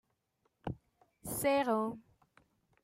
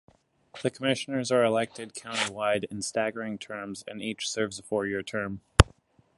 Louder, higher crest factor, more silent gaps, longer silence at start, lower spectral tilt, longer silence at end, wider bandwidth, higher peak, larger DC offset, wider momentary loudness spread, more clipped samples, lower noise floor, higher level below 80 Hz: second, -35 LUFS vs -29 LUFS; second, 18 dB vs 28 dB; neither; about the same, 0.65 s vs 0.55 s; about the same, -4.5 dB/octave vs -4.5 dB/octave; first, 0.85 s vs 0.55 s; first, 16 kHz vs 12 kHz; second, -20 dBFS vs 0 dBFS; neither; first, 19 LU vs 13 LU; neither; first, -79 dBFS vs -61 dBFS; second, -66 dBFS vs -38 dBFS